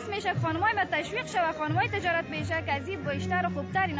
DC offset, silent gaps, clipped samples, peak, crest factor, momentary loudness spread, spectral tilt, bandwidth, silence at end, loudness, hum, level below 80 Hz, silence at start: under 0.1%; none; under 0.1%; -14 dBFS; 16 dB; 5 LU; -5.5 dB/octave; 8 kHz; 0 s; -29 LUFS; none; -50 dBFS; 0 s